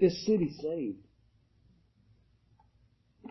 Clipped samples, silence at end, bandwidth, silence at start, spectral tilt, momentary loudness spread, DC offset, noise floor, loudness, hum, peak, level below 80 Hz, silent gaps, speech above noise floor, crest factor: under 0.1%; 0 s; 6 kHz; 0 s; -7 dB/octave; 20 LU; under 0.1%; -68 dBFS; -31 LUFS; none; -12 dBFS; -66 dBFS; none; 38 dB; 22 dB